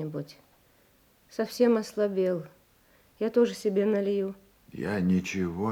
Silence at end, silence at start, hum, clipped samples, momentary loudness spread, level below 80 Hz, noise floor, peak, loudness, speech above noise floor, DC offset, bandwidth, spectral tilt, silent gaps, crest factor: 0 s; 0 s; none; under 0.1%; 16 LU; -68 dBFS; -63 dBFS; -12 dBFS; -28 LUFS; 36 dB; under 0.1%; 17 kHz; -6.5 dB/octave; none; 18 dB